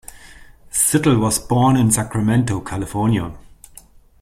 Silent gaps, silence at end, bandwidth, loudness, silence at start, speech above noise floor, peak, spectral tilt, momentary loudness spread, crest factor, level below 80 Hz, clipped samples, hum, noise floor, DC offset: none; 0.8 s; 16 kHz; -17 LUFS; 0.15 s; 29 dB; -2 dBFS; -5 dB/octave; 10 LU; 16 dB; -42 dBFS; under 0.1%; none; -46 dBFS; under 0.1%